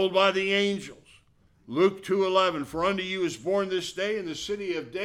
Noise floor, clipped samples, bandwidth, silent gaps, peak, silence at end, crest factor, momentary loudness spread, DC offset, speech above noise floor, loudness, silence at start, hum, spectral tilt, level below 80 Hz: -62 dBFS; under 0.1%; 13 kHz; none; -8 dBFS; 0 s; 18 dB; 9 LU; under 0.1%; 35 dB; -27 LUFS; 0 s; none; -4.5 dB/octave; -62 dBFS